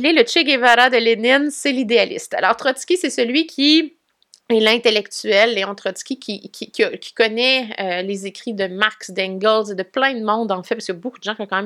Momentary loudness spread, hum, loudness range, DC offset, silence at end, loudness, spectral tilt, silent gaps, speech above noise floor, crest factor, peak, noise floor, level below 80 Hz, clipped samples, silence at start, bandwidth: 13 LU; none; 5 LU; under 0.1%; 0 s; -17 LUFS; -3 dB/octave; none; 37 dB; 18 dB; 0 dBFS; -55 dBFS; -72 dBFS; under 0.1%; 0 s; 14.5 kHz